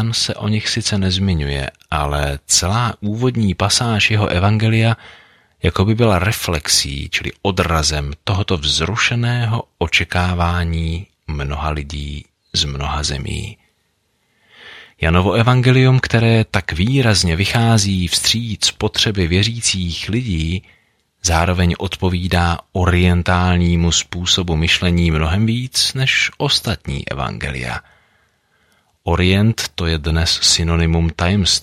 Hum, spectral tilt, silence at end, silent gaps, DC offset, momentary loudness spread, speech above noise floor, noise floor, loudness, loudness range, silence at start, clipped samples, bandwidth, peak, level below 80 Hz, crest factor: none; -4 dB/octave; 0 s; none; under 0.1%; 9 LU; 48 dB; -65 dBFS; -16 LUFS; 6 LU; 0 s; under 0.1%; 15 kHz; -2 dBFS; -30 dBFS; 16 dB